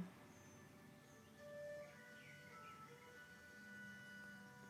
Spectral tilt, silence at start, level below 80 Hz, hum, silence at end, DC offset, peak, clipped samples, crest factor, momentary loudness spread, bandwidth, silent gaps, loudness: -4.5 dB/octave; 0 s; -86 dBFS; none; 0 s; under 0.1%; -40 dBFS; under 0.1%; 18 dB; 8 LU; 15.5 kHz; none; -58 LUFS